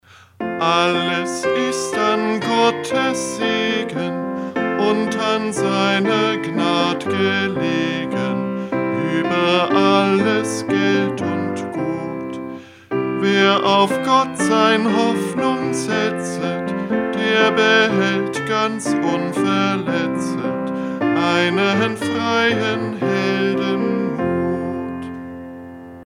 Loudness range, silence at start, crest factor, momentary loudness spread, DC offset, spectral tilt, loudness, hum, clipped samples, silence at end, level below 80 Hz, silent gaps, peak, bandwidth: 3 LU; 0.4 s; 18 dB; 9 LU; under 0.1%; -4.5 dB/octave; -18 LUFS; none; under 0.1%; 0 s; -58 dBFS; none; 0 dBFS; 15.5 kHz